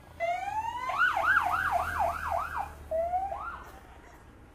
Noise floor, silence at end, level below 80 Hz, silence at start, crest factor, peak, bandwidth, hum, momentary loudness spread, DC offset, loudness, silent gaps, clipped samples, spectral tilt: -52 dBFS; 0.05 s; -50 dBFS; 0 s; 18 dB; -14 dBFS; 15.5 kHz; none; 13 LU; under 0.1%; -30 LUFS; none; under 0.1%; -4 dB/octave